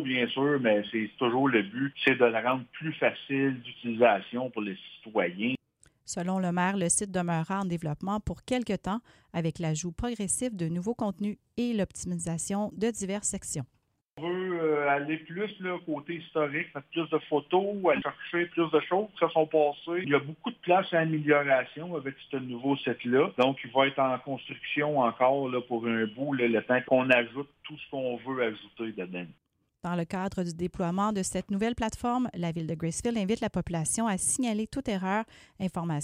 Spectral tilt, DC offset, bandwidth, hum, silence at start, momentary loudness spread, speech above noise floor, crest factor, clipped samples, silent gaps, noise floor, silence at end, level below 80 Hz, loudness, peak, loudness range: -4.5 dB/octave; under 0.1%; 15.5 kHz; none; 0 s; 11 LU; 37 dB; 20 dB; under 0.1%; 14.12-14.16 s; -66 dBFS; 0 s; -58 dBFS; -29 LUFS; -10 dBFS; 5 LU